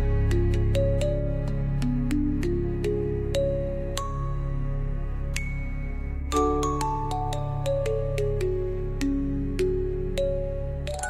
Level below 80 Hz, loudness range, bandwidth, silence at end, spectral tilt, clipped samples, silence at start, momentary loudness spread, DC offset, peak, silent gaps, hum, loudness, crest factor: -30 dBFS; 3 LU; 13.5 kHz; 0 s; -7 dB/octave; under 0.1%; 0 s; 7 LU; under 0.1%; -6 dBFS; none; none; -28 LUFS; 20 dB